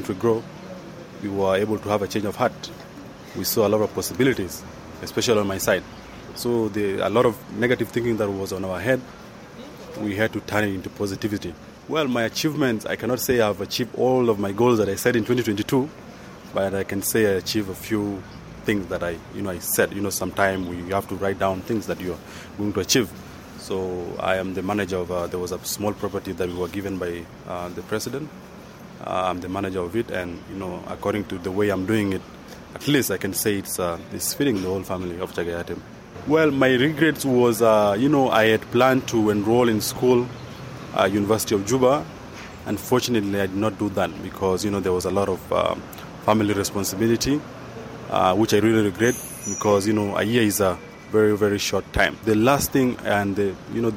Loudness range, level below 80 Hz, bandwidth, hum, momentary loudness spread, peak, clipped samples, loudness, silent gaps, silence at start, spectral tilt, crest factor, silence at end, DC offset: 7 LU; -50 dBFS; 16.5 kHz; none; 17 LU; -4 dBFS; under 0.1%; -23 LUFS; none; 0 s; -5 dB/octave; 20 dB; 0 s; under 0.1%